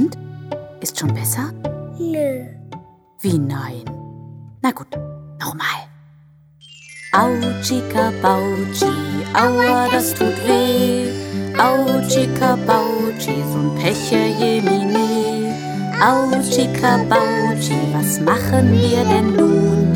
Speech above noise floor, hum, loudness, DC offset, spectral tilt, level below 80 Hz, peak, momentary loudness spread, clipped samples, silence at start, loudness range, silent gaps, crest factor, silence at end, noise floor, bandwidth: 32 dB; none; -17 LUFS; under 0.1%; -5 dB/octave; -50 dBFS; 0 dBFS; 15 LU; under 0.1%; 0 s; 9 LU; none; 16 dB; 0 s; -48 dBFS; 19 kHz